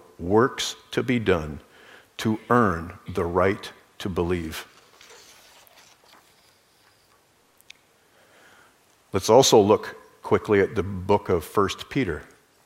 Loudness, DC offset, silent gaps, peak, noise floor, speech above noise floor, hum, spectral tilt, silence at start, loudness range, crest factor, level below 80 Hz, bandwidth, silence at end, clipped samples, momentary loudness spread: -23 LUFS; under 0.1%; none; -4 dBFS; -61 dBFS; 39 dB; none; -4.5 dB/octave; 0.2 s; 13 LU; 22 dB; -50 dBFS; 16 kHz; 0.45 s; under 0.1%; 18 LU